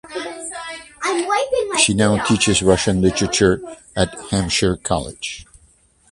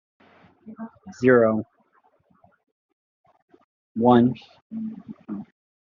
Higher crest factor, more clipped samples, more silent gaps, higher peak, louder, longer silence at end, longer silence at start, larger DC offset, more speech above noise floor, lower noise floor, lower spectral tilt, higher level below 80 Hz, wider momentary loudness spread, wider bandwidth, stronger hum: about the same, 20 dB vs 22 dB; neither; second, none vs 2.72-3.24 s, 3.42-3.48 s, 3.64-3.95 s, 4.62-4.70 s; first, 0 dBFS vs -4 dBFS; first, -18 LUFS vs -21 LUFS; first, 0.7 s vs 0.45 s; second, 0.05 s vs 0.65 s; neither; second, 37 dB vs 42 dB; second, -55 dBFS vs -63 dBFS; second, -4 dB/octave vs -6.5 dB/octave; first, -38 dBFS vs -68 dBFS; second, 14 LU vs 23 LU; first, 11.5 kHz vs 7.2 kHz; neither